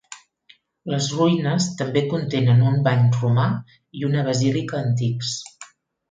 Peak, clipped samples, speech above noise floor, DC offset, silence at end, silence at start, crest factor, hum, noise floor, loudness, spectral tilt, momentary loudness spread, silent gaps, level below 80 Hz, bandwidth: -6 dBFS; under 0.1%; 36 dB; under 0.1%; 0.45 s; 0.1 s; 16 dB; none; -56 dBFS; -21 LUFS; -6 dB/octave; 13 LU; none; -58 dBFS; 9.2 kHz